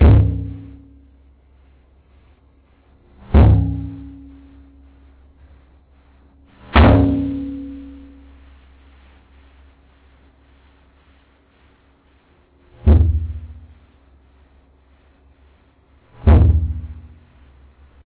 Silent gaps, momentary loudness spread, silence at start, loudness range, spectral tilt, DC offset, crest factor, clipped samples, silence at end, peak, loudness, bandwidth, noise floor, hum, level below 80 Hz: none; 27 LU; 0 s; 10 LU; -12 dB/octave; under 0.1%; 18 dB; under 0.1%; 1.05 s; -2 dBFS; -16 LUFS; 4 kHz; -55 dBFS; none; -22 dBFS